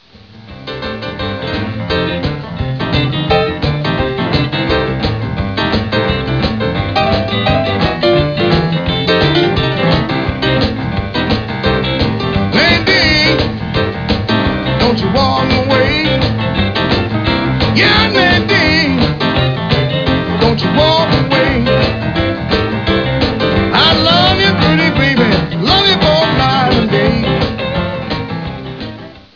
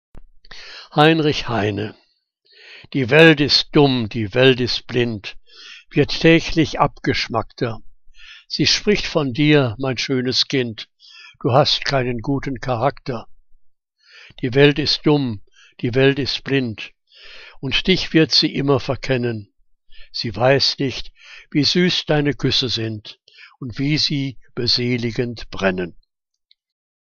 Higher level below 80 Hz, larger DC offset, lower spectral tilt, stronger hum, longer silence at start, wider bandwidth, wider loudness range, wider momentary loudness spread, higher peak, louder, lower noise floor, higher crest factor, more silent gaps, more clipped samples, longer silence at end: first, -28 dBFS vs -40 dBFS; first, 0.2% vs under 0.1%; first, -6.5 dB/octave vs -5 dB/octave; neither; first, 0.3 s vs 0.15 s; second, 5.4 kHz vs 7.4 kHz; about the same, 5 LU vs 5 LU; second, 10 LU vs 17 LU; about the same, -2 dBFS vs 0 dBFS; first, -12 LUFS vs -18 LUFS; second, -37 dBFS vs -63 dBFS; second, 10 dB vs 20 dB; neither; neither; second, 0.15 s vs 1.2 s